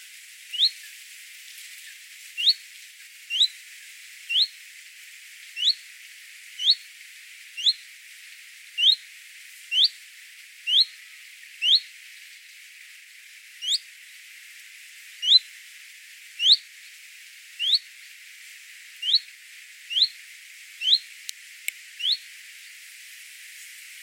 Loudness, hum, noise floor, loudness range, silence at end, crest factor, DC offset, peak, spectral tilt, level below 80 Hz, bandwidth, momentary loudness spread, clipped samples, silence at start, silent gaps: -22 LUFS; none; -48 dBFS; 5 LU; 0 s; 24 dB; under 0.1%; -6 dBFS; 11.5 dB/octave; under -90 dBFS; 17.5 kHz; 24 LU; under 0.1%; 0 s; none